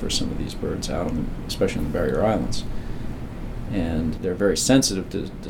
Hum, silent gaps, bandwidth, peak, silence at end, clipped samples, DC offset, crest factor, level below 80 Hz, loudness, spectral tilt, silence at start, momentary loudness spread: none; none; 17.5 kHz; -4 dBFS; 0 s; under 0.1%; under 0.1%; 18 dB; -34 dBFS; -24 LUFS; -4.5 dB/octave; 0 s; 15 LU